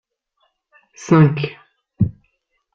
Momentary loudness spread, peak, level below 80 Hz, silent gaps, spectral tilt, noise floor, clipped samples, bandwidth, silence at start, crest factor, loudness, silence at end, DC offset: 14 LU; -2 dBFS; -50 dBFS; none; -8 dB/octave; -68 dBFS; under 0.1%; 7.4 kHz; 1 s; 18 dB; -17 LUFS; 0.65 s; under 0.1%